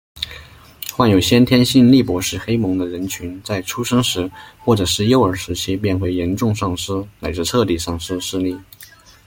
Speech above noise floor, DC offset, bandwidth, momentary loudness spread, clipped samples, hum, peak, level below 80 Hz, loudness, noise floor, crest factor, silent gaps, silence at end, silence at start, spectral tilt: 27 dB; under 0.1%; 17 kHz; 14 LU; under 0.1%; none; -2 dBFS; -44 dBFS; -18 LUFS; -44 dBFS; 16 dB; none; 0.4 s; 0.15 s; -5 dB/octave